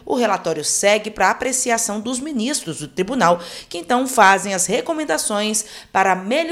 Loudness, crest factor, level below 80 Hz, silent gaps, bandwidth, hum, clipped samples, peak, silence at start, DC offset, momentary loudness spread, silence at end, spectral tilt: -18 LUFS; 18 dB; -54 dBFS; none; 16.5 kHz; none; under 0.1%; 0 dBFS; 0.05 s; under 0.1%; 10 LU; 0 s; -2.5 dB/octave